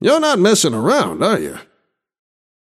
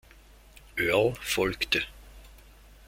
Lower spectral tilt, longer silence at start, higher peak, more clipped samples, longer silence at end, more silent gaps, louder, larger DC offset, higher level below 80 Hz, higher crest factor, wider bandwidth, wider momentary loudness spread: about the same, -4 dB/octave vs -3.5 dB/octave; second, 0 s vs 0.55 s; first, -2 dBFS vs -10 dBFS; neither; first, 1.05 s vs 0.5 s; neither; first, -15 LUFS vs -27 LUFS; neither; second, -58 dBFS vs -50 dBFS; second, 16 dB vs 22 dB; about the same, 15 kHz vs 16.5 kHz; second, 7 LU vs 10 LU